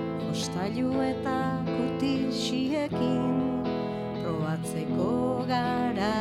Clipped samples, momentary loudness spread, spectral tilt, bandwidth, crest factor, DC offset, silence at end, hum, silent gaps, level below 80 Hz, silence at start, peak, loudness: under 0.1%; 4 LU; -6 dB/octave; 14 kHz; 12 dB; under 0.1%; 0 s; none; none; -56 dBFS; 0 s; -16 dBFS; -29 LUFS